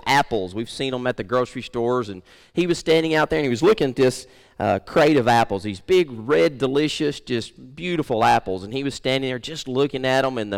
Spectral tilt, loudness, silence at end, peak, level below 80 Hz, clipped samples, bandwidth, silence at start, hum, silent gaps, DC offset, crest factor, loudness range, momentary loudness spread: -5 dB/octave; -21 LUFS; 0 s; -8 dBFS; -50 dBFS; under 0.1%; 17 kHz; 0.05 s; none; none; under 0.1%; 12 dB; 3 LU; 9 LU